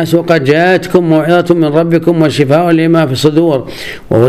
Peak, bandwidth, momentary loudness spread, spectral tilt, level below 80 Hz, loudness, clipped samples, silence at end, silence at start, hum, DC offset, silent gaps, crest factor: 0 dBFS; 14.5 kHz; 5 LU; -7 dB/octave; -44 dBFS; -9 LUFS; 0.8%; 0 s; 0 s; none; 0.9%; none; 10 dB